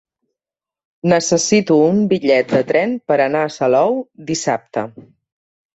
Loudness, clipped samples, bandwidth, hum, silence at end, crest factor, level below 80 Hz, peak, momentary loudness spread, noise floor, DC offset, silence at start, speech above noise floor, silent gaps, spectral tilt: -16 LUFS; under 0.1%; 8.2 kHz; none; 0.75 s; 16 dB; -58 dBFS; -2 dBFS; 10 LU; -89 dBFS; under 0.1%; 1.05 s; 73 dB; none; -4.5 dB/octave